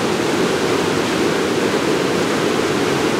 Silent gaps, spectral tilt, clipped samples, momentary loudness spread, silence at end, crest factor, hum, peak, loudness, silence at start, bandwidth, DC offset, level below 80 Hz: none; -4 dB/octave; under 0.1%; 0 LU; 0 s; 12 dB; none; -4 dBFS; -17 LUFS; 0 s; 16 kHz; under 0.1%; -50 dBFS